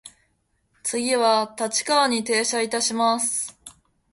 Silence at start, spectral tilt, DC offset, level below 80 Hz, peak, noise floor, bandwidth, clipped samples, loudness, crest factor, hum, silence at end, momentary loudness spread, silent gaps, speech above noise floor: 0.05 s; -1 dB/octave; under 0.1%; -68 dBFS; -6 dBFS; -69 dBFS; 12 kHz; under 0.1%; -22 LUFS; 18 dB; none; 0.4 s; 8 LU; none; 47 dB